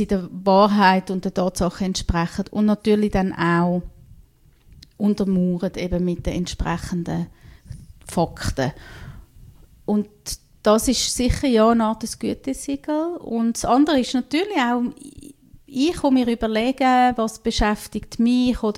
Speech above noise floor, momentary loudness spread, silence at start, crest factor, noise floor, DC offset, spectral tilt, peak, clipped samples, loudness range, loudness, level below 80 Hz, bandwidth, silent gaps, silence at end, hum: 32 dB; 12 LU; 0 s; 18 dB; -53 dBFS; under 0.1%; -5 dB/octave; -2 dBFS; under 0.1%; 7 LU; -21 LUFS; -38 dBFS; 15.5 kHz; none; 0 s; none